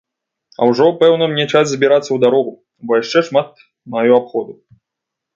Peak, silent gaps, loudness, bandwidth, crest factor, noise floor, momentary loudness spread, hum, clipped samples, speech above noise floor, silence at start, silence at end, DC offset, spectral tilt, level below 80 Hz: 0 dBFS; none; -14 LUFS; 7.6 kHz; 16 dB; -81 dBFS; 13 LU; none; under 0.1%; 67 dB; 0.6 s; 0.85 s; under 0.1%; -5 dB/octave; -66 dBFS